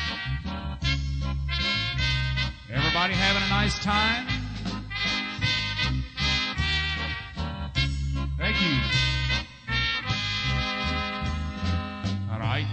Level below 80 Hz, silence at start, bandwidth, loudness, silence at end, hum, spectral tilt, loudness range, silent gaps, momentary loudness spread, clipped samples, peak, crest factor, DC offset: -34 dBFS; 0 s; 9 kHz; -26 LUFS; 0 s; none; -4.5 dB/octave; 2 LU; none; 8 LU; under 0.1%; -8 dBFS; 18 dB; under 0.1%